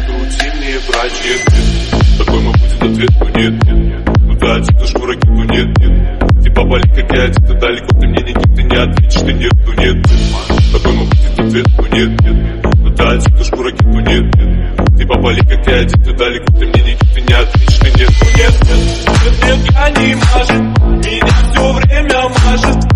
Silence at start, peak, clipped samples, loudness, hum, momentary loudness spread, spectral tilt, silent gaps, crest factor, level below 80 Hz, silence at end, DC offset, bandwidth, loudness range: 0 s; 0 dBFS; 0.6%; -11 LUFS; none; 4 LU; -6 dB/octave; none; 8 dB; -10 dBFS; 0 s; under 0.1%; 10.5 kHz; 2 LU